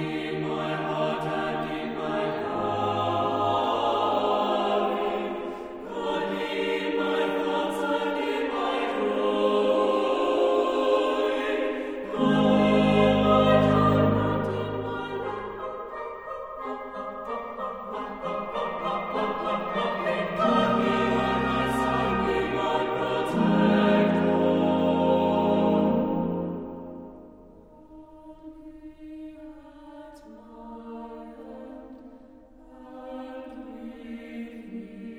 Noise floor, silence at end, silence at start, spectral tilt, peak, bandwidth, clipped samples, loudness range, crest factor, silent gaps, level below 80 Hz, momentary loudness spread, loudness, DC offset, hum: -50 dBFS; 0 s; 0 s; -7 dB/octave; -8 dBFS; over 20 kHz; under 0.1%; 21 LU; 18 dB; none; -52 dBFS; 21 LU; -25 LUFS; under 0.1%; none